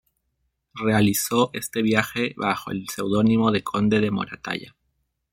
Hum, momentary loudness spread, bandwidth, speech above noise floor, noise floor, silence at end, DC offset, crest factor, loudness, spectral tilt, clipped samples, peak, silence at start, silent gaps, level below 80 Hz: none; 11 LU; 16.5 kHz; 52 dB; -74 dBFS; 0.65 s; under 0.1%; 20 dB; -23 LUFS; -5 dB/octave; under 0.1%; -2 dBFS; 0.75 s; none; -56 dBFS